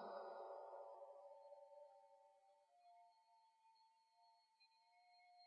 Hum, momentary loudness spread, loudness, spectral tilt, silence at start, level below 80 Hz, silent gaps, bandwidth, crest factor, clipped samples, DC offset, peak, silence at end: none; 11 LU; -59 LUFS; -2 dB/octave; 0 s; under -90 dBFS; none; 5.4 kHz; 22 dB; under 0.1%; under 0.1%; -40 dBFS; 0 s